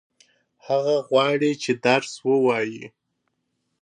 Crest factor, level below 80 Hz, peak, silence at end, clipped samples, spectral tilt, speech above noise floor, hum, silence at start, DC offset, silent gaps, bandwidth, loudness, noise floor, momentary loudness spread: 20 dB; -76 dBFS; -4 dBFS; 0.95 s; under 0.1%; -5 dB/octave; 54 dB; none; 0.65 s; under 0.1%; none; 10 kHz; -22 LUFS; -75 dBFS; 6 LU